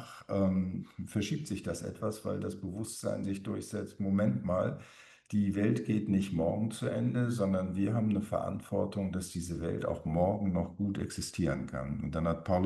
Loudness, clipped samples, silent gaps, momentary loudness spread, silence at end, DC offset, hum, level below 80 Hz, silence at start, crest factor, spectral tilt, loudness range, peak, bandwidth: -34 LUFS; under 0.1%; none; 8 LU; 0 s; under 0.1%; none; -56 dBFS; 0 s; 18 dB; -7 dB/octave; 4 LU; -16 dBFS; 12.5 kHz